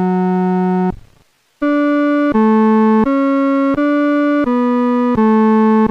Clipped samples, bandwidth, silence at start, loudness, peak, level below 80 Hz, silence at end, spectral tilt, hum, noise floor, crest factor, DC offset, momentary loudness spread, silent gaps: under 0.1%; 6 kHz; 0 s; -14 LUFS; -4 dBFS; -44 dBFS; 0 s; -9 dB/octave; none; -54 dBFS; 10 dB; under 0.1%; 5 LU; none